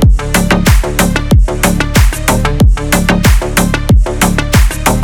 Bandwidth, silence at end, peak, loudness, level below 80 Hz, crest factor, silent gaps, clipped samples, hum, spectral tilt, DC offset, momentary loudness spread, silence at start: 19 kHz; 0 s; 0 dBFS; -11 LUFS; -12 dBFS; 8 dB; none; under 0.1%; none; -5 dB/octave; under 0.1%; 3 LU; 0 s